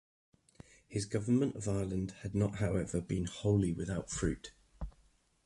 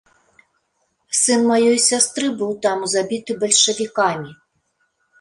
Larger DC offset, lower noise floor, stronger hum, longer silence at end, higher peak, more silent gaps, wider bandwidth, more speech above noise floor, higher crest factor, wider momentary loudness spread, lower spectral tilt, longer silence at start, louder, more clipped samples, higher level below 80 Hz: neither; about the same, -69 dBFS vs -69 dBFS; neither; second, 0.55 s vs 0.9 s; second, -18 dBFS vs -2 dBFS; neither; about the same, 11.5 kHz vs 11.5 kHz; second, 35 dB vs 51 dB; about the same, 18 dB vs 18 dB; first, 17 LU vs 9 LU; first, -6.5 dB/octave vs -2 dB/octave; second, 0.9 s vs 1.1 s; second, -35 LUFS vs -17 LUFS; neither; first, -50 dBFS vs -66 dBFS